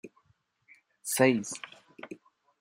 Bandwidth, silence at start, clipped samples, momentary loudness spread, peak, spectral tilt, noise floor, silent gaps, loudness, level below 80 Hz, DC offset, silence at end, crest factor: 15.5 kHz; 0.05 s; under 0.1%; 23 LU; -10 dBFS; -4 dB/octave; -71 dBFS; none; -28 LUFS; -78 dBFS; under 0.1%; 0.45 s; 22 dB